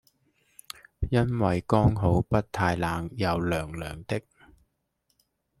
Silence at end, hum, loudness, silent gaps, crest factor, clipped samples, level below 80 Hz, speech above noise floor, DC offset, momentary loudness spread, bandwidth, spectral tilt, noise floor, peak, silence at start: 1.4 s; none; -27 LUFS; none; 22 dB; under 0.1%; -44 dBFS; 50 dB; under 0.1%; 13 LU; 14.5 kHz; -7 dB/octave; -75 dBFS; -6 dBFS; 1 s